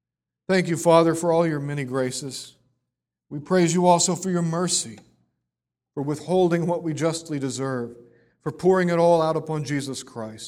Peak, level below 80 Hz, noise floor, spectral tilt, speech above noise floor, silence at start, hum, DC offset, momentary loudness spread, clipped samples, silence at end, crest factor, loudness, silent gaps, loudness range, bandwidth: -2 dBFS; -64 dBFS; -86 dBFS; -5 dB/octave; 63 dB; 0.5 s; none; under 0.1%; 17 LU; under 0.1%; 0 s; 20 dB; -22 LUFS; none; 3 LU; 15 kHz